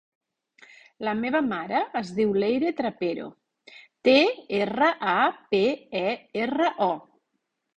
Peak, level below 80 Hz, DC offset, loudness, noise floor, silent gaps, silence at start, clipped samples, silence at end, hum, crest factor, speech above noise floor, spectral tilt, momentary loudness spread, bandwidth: -8 dBFS; -68 dBFS; under 0.1%; -25 LUFS; -79 dBFS; none; 1 s; under 0.1%; 0.75 s; none; 18 dB; 54 dB; -6 dB/octave; 10 LU; 9.2 kHz